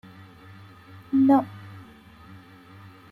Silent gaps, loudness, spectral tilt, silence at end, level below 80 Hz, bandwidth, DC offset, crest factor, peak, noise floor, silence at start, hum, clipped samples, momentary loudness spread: none; -21 LUFS; -8.5 dB/octave; 1.3 s; -66 dBFS; 4.7 kHz; under 0.1%; 20 dB; -8 dBFS; -49 dBFS; 1.1 s; none; under 0.1%; 28 LU